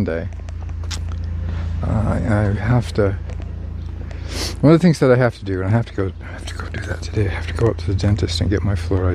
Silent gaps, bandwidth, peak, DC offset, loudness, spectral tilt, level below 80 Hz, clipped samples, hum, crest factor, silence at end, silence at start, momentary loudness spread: none; 12.5 kHz; -2 dBFS; under 0.1%; -20 LUFS; -7 dB/octave; -30 dBFS; under 0.1%; none; 18 dB; 0 s; 0 s; 15 LU